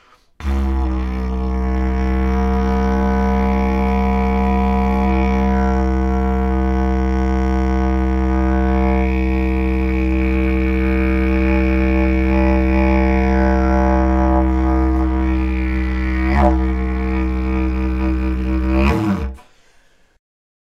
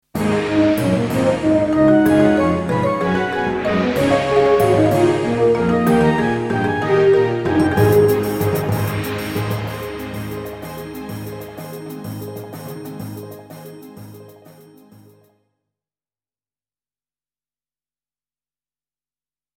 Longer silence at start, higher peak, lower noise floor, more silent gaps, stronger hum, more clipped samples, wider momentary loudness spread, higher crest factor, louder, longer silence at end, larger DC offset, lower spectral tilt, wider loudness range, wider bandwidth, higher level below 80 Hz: first, 0.4 s vs 0.15 s; about the same, 0 dBFS vs 0 dBFS; second, -52 dBFS vs under -90 dBFS; neither; neither; neither; second, 5 LU vs 18 LU; about the same, 16 dB vs 18 dB; about the same, -18 LUFS vs -17 LUFS; second, 1.2 s vs 5.05 s; neither; first, -9 dB/octave vs -7 dB/octave; second, 3 LU vs 17 LU; second, 6.2 kHz vs 17 kHz; first, -18 dBFS vs -44 dBFS